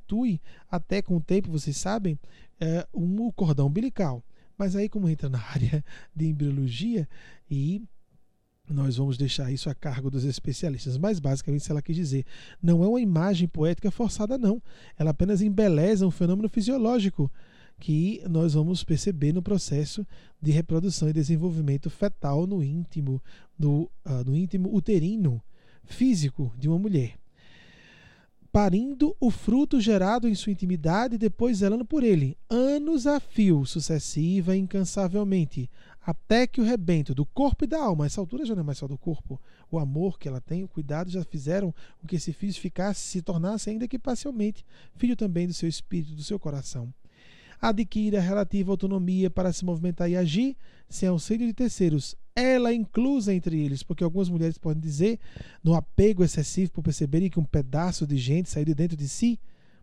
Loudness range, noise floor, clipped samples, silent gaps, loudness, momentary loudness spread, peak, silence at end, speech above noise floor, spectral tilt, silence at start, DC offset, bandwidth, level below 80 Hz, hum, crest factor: 6 LU; -62 dBFS; under 0.1%; none; -27 LUFS; 9 LU; -8 dBFS; 0.3 s; 37 dB; -7 dB/octave; 0 s; under 0.1%; 11 kHz; -44 dBFS; none; 18 dB